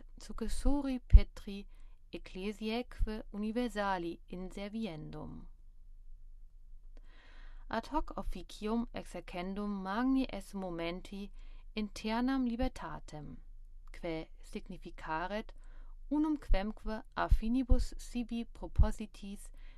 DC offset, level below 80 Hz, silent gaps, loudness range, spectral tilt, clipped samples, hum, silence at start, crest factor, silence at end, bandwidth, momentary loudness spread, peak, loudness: under 0.1%; -36 dBFS; none; 9 LU; -6.5 dB/octave; under 0.1%; none; 0 s; 28 dB; 0 s; 12.5 kHz; 17 LU; -6 dBFS; -37 LUFS